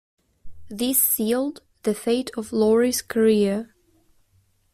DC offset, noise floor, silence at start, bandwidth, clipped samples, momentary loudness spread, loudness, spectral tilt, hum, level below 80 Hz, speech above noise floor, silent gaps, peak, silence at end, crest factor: under 0.1%; -63 dBFS; 0.45 s; 16 kHz; under 0.1%; 12 LU; -22 LUFS; -4 dB/octave; none; -58 dBFS; 42 dB; none; -8 dBFS; 1.1 s; 16 dB